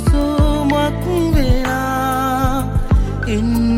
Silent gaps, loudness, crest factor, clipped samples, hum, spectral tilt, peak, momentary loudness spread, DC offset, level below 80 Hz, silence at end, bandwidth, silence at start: none; -17 LUFS; 12 dB; under 0.1%; none; -6.5 dB/octave; -2 dBFS; 3 LU; under 0.1%; -20 dBFS; 0 s; 16.5 kHz; 0 s